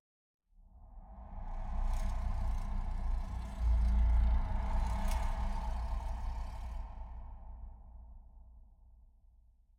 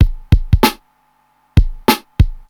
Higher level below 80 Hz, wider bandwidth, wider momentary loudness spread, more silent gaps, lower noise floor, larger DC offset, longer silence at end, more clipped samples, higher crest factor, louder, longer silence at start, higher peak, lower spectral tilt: second, -36 dBFS vs -18 dBFS; second, 10 kHz vs over 20 kHz; first, 23 LU vs 4 LU; neither; first, -64 dBFS vs -58 dBFS; neither; first, 0.85 s vs 0.1 s; neither; about the same, 14 dB vs 14 dB; second, -38 LUFS vs -16 LUFS; first, 0.75 s vs 0 s; second, -22 dBFS vs 0 dBFS; first, -7 dB/octave vs -5.5 dB/octave